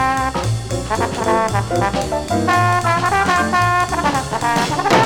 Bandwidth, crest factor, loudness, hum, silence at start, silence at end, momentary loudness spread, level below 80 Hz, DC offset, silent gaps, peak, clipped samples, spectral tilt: 18.5 kHz; 16 dB; -17 LUFS; none; 0 s; 0 s; 6 LU; -36 dBFS; under 0.1%; none; 0 dBFS; under 0.1%; -4.5 dB/octave